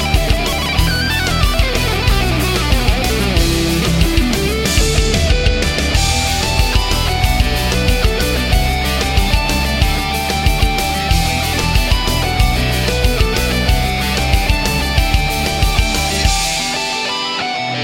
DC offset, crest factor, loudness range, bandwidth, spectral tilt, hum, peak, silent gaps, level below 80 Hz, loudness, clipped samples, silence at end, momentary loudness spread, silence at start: under 0.1%; 14 dB; 1 LU; 16.5 kHz; -4 dB/octave; none; 0 dBFS; none; -18 dBFS; -15 LUFS; under 0.1%; 0 s; 2 LU; 0 s